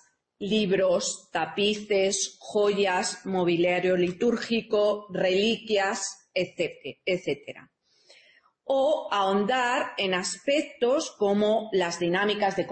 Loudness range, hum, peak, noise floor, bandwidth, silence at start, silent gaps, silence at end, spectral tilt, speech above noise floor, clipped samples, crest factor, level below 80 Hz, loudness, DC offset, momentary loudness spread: 4 LU; none; -12 dBFS; -60 dBFS; 8.8 kHz; 0.4 s; none; 0 s; -3.5 dB/octave; 34 dB; under 0.1%; 14 dB; -66 dBFS; -26 LUFS; under 0.1%; 7 LU